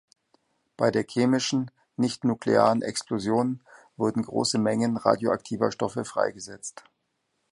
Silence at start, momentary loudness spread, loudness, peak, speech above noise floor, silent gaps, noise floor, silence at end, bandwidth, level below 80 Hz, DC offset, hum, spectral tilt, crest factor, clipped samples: 0.8 s; 7 LU; -26 LUFS; -4 dBFS; 51 dB; none; -76 dBFS; 0.7 s; 11.5 kHz; -66 dBFS; under 0.1%; none; -5 dB/octave; 22 dB; under 0.1%